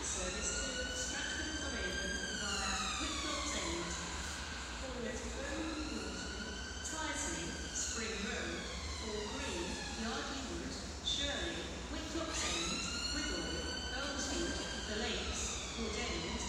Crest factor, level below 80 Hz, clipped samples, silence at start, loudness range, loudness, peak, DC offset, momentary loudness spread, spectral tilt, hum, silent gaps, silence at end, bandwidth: 16 dB; -48 dBFS; under 0.1%; 0 s; 3 LU; -39 LUFS; -24 dBFS; under 0.1%; 6 LU; -2.5 dB/octave; none; none; 0 s; 15.5 kHz